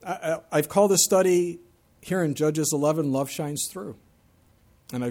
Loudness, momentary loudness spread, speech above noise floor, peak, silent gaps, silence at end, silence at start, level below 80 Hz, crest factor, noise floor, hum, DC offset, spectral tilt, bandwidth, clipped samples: -24 LUFS; 14 LU; 36 dB; -6 dBFS; none; 0 s; 0.05 s; -64 dBFS; 18 dB; -60 dBFS; none; under 0.1%; -4.5 dB/octave; 17.5 kHz; under 0.1%